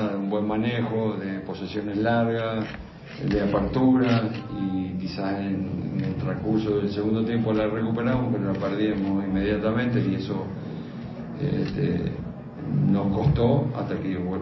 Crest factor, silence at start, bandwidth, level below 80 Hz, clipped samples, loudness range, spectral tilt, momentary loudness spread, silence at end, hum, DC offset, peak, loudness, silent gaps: 16 dB; 0 s; 6 kHz; -44 dBFS; under 0.1%; 2 LU; -9 dB/octave; 10 LU; 0 s; none; under 0.1%; -8 dBFS; -26 LUFS; none